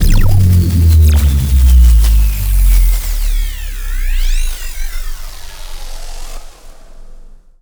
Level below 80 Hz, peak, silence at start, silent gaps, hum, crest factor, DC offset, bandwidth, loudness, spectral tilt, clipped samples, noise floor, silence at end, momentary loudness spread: -12 dBFS; 0 dBFS; 0 s; none; none; 10 dB; under 0.1%; over 20 kHz; -13 LUFS; -5.5 dB/octave; under 0.1%; -33 dBFS; 0.35 s; 22 LU